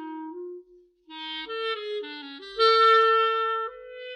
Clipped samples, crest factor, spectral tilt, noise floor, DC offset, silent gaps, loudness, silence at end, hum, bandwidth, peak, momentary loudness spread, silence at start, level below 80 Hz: under 0.1%; 16 dB; -1 dB/octave; -55 dBFS; under 0.1%; none; -23 LUFS; 0 s; none; 9.4 kHz; -10 dBFS; 22 LU; 0 s; -70 dBFS